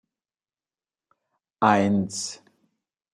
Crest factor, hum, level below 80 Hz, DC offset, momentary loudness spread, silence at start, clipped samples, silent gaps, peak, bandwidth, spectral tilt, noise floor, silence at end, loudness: 24 dB; none; -70 dBFS; under 0.1%; 12 LU; 1.6 s; under 0.1%; none; -2 dBFS; 12 kHz; -5 dB/octave; under -90 dBFS; 0.8 s; -23 LUFS